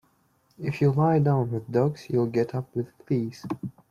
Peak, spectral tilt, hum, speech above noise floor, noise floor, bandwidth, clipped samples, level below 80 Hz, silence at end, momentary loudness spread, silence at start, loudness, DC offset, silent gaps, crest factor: -12 dBFS; -9 dB/octave; none; 41 dB; -66 dBFS; 7.2 kHz; under 0.1%; -62 dBFS; 0.2 s; 13 LU; 0.6 s; -26 LUFS; under 0.1%; none; 14 dB